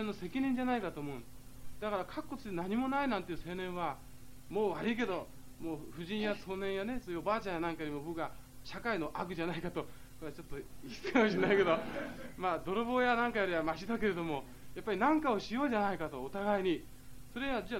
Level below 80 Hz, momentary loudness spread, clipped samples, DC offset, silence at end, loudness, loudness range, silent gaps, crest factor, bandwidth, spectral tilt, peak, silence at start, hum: -56 dBFS; 17 LU; under 0.1%; 0.3%; 0 s; -36 LUFS; 6 LU; none; 22 dB; 16 kHz; -6 dB/octave; -14 dBFS; 0 s; none